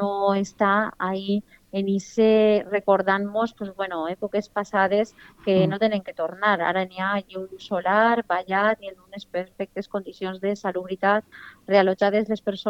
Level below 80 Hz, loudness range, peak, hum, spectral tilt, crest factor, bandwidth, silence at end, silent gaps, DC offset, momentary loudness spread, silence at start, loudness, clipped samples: -62 dBFS; 3 LU; -6 dBFS; none; -6 dB/octave; 18 dB; 8.2 kHz; 0 s; none; under 0.1%; 12 LU; 0 s; -23 LUFS; under 0.1%